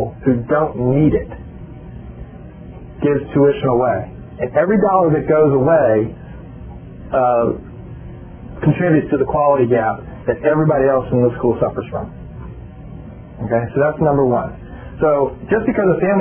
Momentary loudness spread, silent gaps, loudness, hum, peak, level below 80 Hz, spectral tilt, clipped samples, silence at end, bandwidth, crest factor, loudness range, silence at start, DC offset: 21 LU; none; -16 LUFS; none; -2 dBFS; -38 dBFS; -12.5 dB/octave; under 0.1%; 0 s; 3.4 kHz; 16 dB; 4 LU; 0 s; under 0.1%